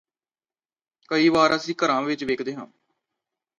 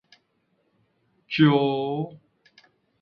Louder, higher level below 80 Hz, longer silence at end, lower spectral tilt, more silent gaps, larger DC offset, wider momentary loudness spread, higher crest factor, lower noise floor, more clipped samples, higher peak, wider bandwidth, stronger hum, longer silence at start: about the same, -22 LUFS vs -23 LUFS; about the same, -64 dBFS vs -68 dBFS; about the same, 0.95 s vs 0.85 s; second, -4.5 dB/octave vs -9 dB/octave; neither; neither; about the same, 12 LU vs 13 LU; about the same, 20 dB vs 22 dB; first, under -90 dBFS vs -70 dBFS; neither; about the same, -6 dBFS vs -6 dBFS; first, 9.2 kHz vs 6 kHz; neither; second, 1.1 s vs 1.3 s